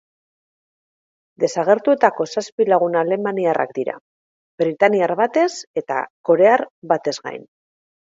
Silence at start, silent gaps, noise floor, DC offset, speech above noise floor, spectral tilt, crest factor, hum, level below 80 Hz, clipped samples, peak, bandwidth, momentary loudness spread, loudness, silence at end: 1.4 s; 2.52-2.58 s, 4.01-4.58 s, 5.67-5.74 s, 6.10-6.24 s, 6.70-6.82 s; under -90 dBFS; under 0.1%; over 72 dB; -5 dB/octave; 20 dB; none; -72 dBFS; under 0.1%; 0 dBFS; 7.8 kHz; 12 LU; -19 LUFS; 0.7 s